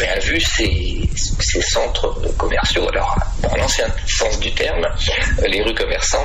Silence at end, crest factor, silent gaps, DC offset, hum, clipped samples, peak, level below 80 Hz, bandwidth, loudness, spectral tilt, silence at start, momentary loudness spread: 0 s; 10 dB; none; under 0.1%; none; under 0.1%; -6 dBFS; -22 dBFS; 14 kHz; -18 LUFS; -3 dB/octave; 0 s; 4 LU